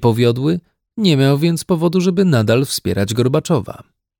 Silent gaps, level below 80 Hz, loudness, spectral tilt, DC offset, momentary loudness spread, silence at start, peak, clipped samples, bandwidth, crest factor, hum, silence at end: none; -50 dBFS; -16 LUFS; -6 dB/octave; under 0.1%; 6 LU; 0 s; -2 dBFS; under 0.1%; 19 kHz; 14 dB; none; 0.35 s